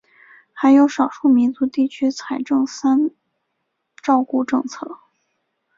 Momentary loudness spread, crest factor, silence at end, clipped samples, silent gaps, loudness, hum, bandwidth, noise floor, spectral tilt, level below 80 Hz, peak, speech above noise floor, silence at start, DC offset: 13 LU; 16 dB; 0.85 s; under 0.1%; none; -18 LUFS; none; 7.6 kHz; -74 dBFS; -4.5 dB/octave; -66 dBFS; -4 dBFS; 57 dB; 0.55 s; under 0.1%